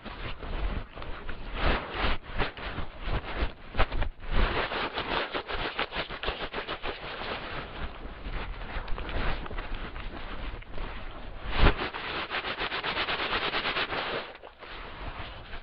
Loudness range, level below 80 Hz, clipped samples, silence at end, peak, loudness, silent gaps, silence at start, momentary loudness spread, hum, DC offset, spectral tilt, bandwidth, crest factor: 8 LU; -34 dBFS; under 0.1%; 0 s; -6 dBFS; -33 LUFS; none; 0 s; 13 LU; none; under 0.1%; -2.5 dB/octave; 5.6 kHz; 24 dB